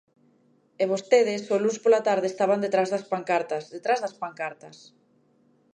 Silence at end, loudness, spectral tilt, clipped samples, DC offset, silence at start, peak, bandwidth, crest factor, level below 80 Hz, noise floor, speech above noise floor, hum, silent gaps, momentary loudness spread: 1.05 s; -25 LUFS; -4.5 dB/octave; under 0.1%; under 0.1%; 0.8 s; -6 dBFS; 9.6 kHz; 20 dB; -82 dBFS; -63 dBFS; 39 dB; none; none; 12 LU